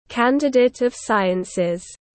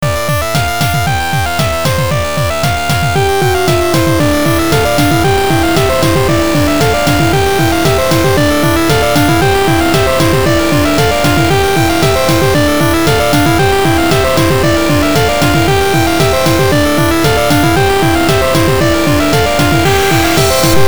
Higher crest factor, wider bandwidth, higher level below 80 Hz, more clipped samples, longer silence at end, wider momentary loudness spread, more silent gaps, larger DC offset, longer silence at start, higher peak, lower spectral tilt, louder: about the same, 14 dB vs 10 dB; second, 8.8 kHz vs over 20 kHz; second, -56 dBFS vs -26 dBFS; second, under 0.1% vs 0.1%; first, 0.2 s vs 0 s; first, 7 LU vs 3 LU; neither; second, under 0.1% vs 8%; about the same, 0.1 s vs 0 s; second, -4 dBFS vs 0 dBFS; about the same, -5 dB/octave vs -5 dB/octave; second, -20 LUFS vs -10 LUFS